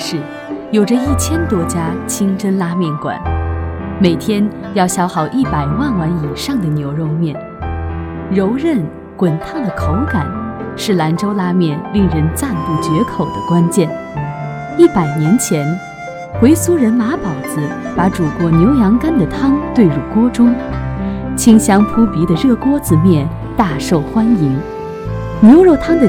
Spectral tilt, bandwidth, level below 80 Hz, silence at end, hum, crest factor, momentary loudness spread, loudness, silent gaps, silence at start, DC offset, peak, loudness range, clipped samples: -6.5 dB/octave; 17.5 kHz; -32 dBFS; 0 s; none; 14 dB; 12 LU; -14 LUFS; none; 0 s; under 0.1%; 0 dBFS; 5 LU; 0.4%